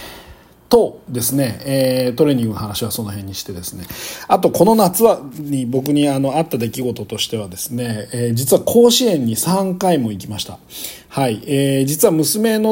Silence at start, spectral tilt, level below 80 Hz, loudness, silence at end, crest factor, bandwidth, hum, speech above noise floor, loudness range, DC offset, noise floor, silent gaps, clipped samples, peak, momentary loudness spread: 0 s; -5 dB/octave; -52 dBFS; -17 LUFS; 0 s; 16 dB; 17 kHz; none; 26 dB; 3 LU; under 0.1%; -43 dBFS; none; under 0.1%; 0 dBFS; 14 LU